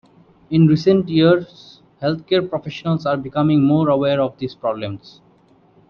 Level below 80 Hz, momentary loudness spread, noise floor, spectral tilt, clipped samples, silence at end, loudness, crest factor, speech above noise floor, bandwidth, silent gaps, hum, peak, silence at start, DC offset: -54 dBFS; 11 LU; -53 dBFS; -8.5 dB/octave; under 0.1%; 0.9 s; -18 LUFS; 16 dB; 36 dB; 6.6 kHz; none; none; -2 dBFS; 0.5 s; under 0.1%